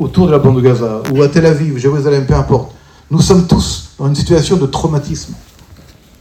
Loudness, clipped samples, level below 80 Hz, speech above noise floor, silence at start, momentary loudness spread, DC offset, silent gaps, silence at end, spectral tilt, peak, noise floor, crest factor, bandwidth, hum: -12 LUFS; 0.4%; -28 dBFS; 29 dB; 0 s; 9 LU; under 0.1%; none; 0.8 s; -6.5 dB/octave; 0 dBFS; -40 dBFS; 12 dB; 14.5 kHz; none